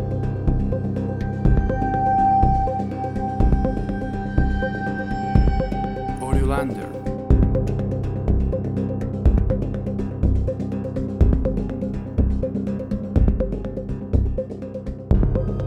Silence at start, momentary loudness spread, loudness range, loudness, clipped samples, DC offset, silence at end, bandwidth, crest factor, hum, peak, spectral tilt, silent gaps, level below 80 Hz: 0 s; 7 LU; 3 LU; -23 LUFS; under 0.1%; under 0.1%; 0 s; 11 kHz; 20 dB; none; 0 dBFS; -9.5 dB/octave; none; -24 dBFS